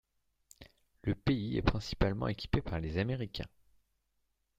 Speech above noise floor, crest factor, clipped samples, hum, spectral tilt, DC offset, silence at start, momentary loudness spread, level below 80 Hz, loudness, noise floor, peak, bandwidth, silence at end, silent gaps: 46 dB; 24 dB; under 0.1%; none; -7 dB/octave; under 0.1%; 0.6 s; 9 LU; -46 dBFS; -35 LUFS; -80 dBFS; -12 dBFS; 14.5 kHz; 1.1 s; none